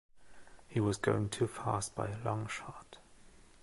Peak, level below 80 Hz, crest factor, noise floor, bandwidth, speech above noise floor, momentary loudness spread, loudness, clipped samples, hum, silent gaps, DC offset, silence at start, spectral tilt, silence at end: -16 dBFS; -60 dBFS; 22 dB; -58 dBFS; 11.5 kHz; 23 dB; 14 LU; -36 LUFS; under 0.1%; none; none; under 0.1%; 0.15 s; -5.5 dB/octave; 0.1 s